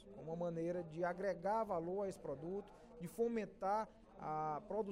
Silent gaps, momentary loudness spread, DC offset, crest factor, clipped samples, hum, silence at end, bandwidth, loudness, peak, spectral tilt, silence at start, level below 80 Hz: none; 10 LU; under 0.1%; 14 dB; under 0.1%; none; 0 s; 15.5 kHz; -43 LUFS; -28 dBFS; -7.5 dB/octave; 0 s; -70 dBFS